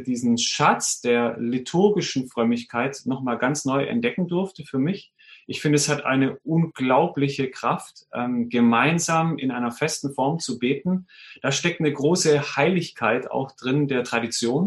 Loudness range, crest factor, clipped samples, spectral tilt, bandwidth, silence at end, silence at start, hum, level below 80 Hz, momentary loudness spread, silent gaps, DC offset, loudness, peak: 2 LU; 18 dB; under 0.1%; -4.5 dB/octave; 12.5 kHz; 0 s; 0 s; none; -66 dBFS; 8 LU; none; under 0.1%; -23 LUFS; -4 dBFS